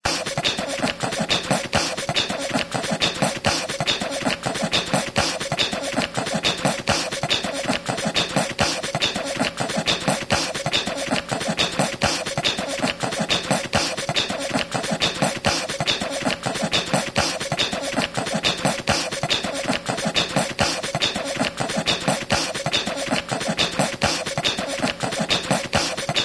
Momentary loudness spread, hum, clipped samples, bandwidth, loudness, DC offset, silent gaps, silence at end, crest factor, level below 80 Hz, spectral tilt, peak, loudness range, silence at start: 3 LU; none; under 0.1%; 11 kHz; -22 LUFS; under 0.1%; none; 0 s; 20 dB; -48 dBFS; -3 dB/octave; -4 dBFS; 0 LU; 0.05 s